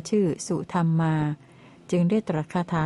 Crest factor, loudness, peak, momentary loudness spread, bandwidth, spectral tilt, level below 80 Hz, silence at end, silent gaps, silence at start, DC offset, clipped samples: 12 dB; -25 LUFS; -12 dBFS; 6 LU; 11.5 kHz; -7 dB/octave; -58 dBFS; 0 s; none; 0 s; under 0.1%; under 0.1%